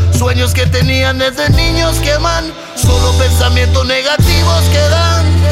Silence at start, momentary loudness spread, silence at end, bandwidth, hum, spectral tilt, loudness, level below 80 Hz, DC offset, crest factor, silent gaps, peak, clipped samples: 0 s; 3 LU; 0 s; 16 kHz; none; -4.5 dB/octave; -11 LUFS; -18 dBFS; 0.9%; 10 dB; none; 0 dBFS; under 0.1%